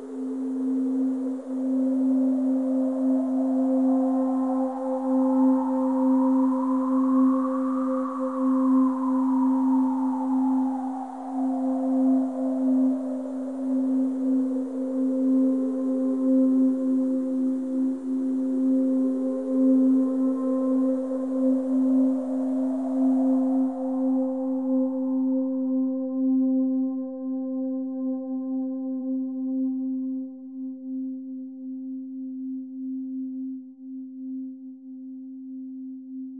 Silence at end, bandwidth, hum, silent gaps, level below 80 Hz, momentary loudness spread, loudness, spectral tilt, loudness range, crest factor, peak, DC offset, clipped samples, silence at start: 0 s; 2 kHz; none; none; -86 dBFS; 14 LU; -25 LUFS; -8 dB/octave; 11 LU; 12 dB; -12 dBFS; 0.1%; under 0.1%; 0 s